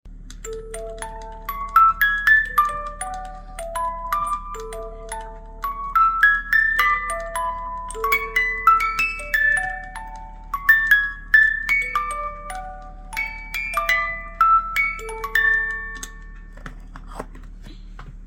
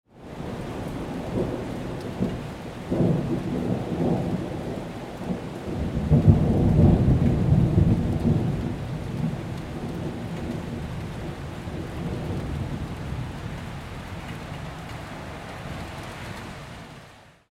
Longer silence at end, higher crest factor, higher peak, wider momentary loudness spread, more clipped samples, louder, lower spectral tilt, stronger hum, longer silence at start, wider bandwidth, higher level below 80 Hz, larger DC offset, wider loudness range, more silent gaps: second, 0 s vs 0.25 s; about the same, 20 dB vs 22 dB; about the same, -4 dBFS vs -4 dBFS; first, 21 LU vs 16 LU; neither; first, -19 LUFS vs -27 LUFS; second, -2 dB/octave vs -8 dB/octave; neither; about the same, 0.05 s vs 0.15 s; first, 16.5 kHz vs 14.5 kHz; about the same, -38 dBFS vs -36 dBFS; neither; second, 5 LU vs 14 LU; neither